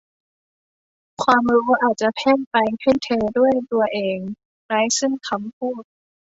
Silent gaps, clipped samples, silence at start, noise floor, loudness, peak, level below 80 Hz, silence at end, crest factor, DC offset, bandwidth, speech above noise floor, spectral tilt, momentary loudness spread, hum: 2.47-2.51 s, 4.45-4.69 s, 5.53-5.61 s; under 0.1%; 1.2 s; under -90 dBFS; -20 LUFS; -2 dBFS; -58 dBFS; 0.45 s; 20 dB; under 0.1%; 8 kHz; over 71 dB; -3.5 dB/octave; 11 LU; none